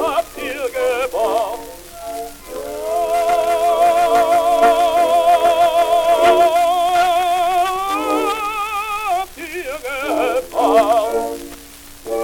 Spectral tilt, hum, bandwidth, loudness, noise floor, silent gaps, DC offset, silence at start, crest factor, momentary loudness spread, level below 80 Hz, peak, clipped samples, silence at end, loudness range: -2.5 dB/octave; none; 18.5 kHz; -16 LUFS; -38 dBFS; none; under 0.1%; 0 s; 16 dB; 15 LU; -46 dBFS; -2 dBFS; under 0.1%; 0 s; 6 LU